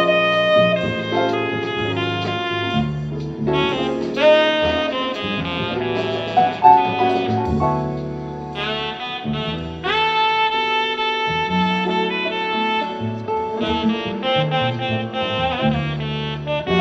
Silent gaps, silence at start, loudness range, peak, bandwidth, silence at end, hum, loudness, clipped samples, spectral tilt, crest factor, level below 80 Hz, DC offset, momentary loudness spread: none; 0 s; 3 LU; 0 dBFS; 8 kHz; 0 s; none; -19 LUFS; under 0.1%; -6 dB/octave; 20 dB; -44 dBFS; under 0.1%; 10 LU